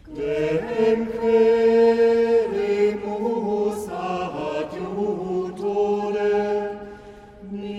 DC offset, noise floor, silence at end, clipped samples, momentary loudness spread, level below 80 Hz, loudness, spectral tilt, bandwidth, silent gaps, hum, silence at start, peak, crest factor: under 0.1%; -43 dBFS; 0 s; under 0.1%; 12 LU; -52 dBFS; -22 LUFS; -6.5 dB/octave; 11.5 kHz; none; none; 0.05 s; -8 dBFS; 14 dB